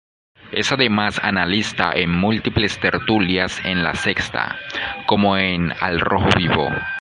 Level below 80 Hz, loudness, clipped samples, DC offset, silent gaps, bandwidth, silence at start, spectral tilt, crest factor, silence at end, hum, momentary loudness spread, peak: -40 dBFS; -19 LUFS; under 0.1%; under 0.1%; none; 11 kHz; 0.45 s; -5 dB/octave; 20 dB; 0 s; none; 6 LU; 0 dBFS